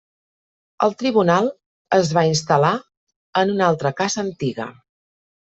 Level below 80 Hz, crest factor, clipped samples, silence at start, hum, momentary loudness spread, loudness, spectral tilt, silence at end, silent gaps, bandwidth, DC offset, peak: -60 dBFS; 18 dB; under 0.1%; 0.8 s; none; 9 LU; -19 LUFS; -5 dB/octave; 0.7 s; 1.66-1.85 s, 2.97-3.07 s, 3.16-3.33 s; 8.2 kHz; under 0.1%; -4 dBFS